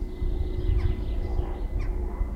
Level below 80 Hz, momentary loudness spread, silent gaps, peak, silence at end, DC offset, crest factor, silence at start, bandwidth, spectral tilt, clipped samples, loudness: -28 dBFS; 5 LU; none; -12 dBFS; 0 s; under 0.1%; 14 dB; 0 s; 5.6 kHz; -8.5 dB/octave; under 0.1%; -31 LUFS